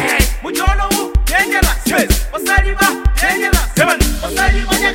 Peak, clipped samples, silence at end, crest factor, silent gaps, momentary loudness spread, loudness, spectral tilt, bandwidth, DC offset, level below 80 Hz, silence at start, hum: 0 dBFS; under 0.1%; 0 s; 14 dB; none; 3 LU; -14 LUFS; -3.5 dB/octave; 17 kHz; under 0.1%; -18 dBFS; 0 s; none